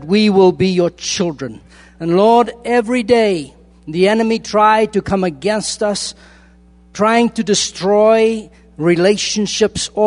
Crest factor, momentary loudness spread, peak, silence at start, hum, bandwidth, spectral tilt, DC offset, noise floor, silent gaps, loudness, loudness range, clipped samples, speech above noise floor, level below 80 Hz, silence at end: 14 dB; 11 LU; 0 dBFS; 0 s; none; 11 kHz; -4.5 dB/octave; under 0.1%; -46 dBFS; none; -14 LUFS; 2 LU; under 0.1%; 32 dB; -46 dBFS; 0 s